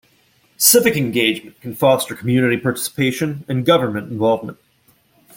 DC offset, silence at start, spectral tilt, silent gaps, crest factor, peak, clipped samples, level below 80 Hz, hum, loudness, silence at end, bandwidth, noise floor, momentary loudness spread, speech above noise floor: under 0.1%; 0.6 s; -4 dB/octave; none; 18 dB; 0 dBFS; under 0.1%; -56 dBFS; none; -17 LUFS; 0.85 s; 17 kHz; -58 dBFS; 11 LU; 40 dB